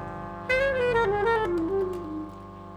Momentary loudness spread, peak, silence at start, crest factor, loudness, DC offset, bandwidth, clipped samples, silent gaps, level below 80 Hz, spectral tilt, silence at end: 13 LU; -12 dBFS; 0 s; 14 dB; -26 LUFS; under 0.1%; 14.5 kHz; under 0.1%; none; -46 dBFS; -6.5 dB/octave; 0 s